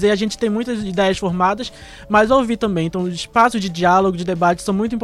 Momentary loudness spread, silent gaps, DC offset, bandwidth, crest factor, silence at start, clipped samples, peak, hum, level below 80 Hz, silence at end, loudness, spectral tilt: 7 LU; none; under 0.1%; 13.5 kHz; 14 dB; 0 s; under 0.1%; -2 dBFS; none; -42 dBFS; 0 s; -18 LUFS; -5.5 dB/octave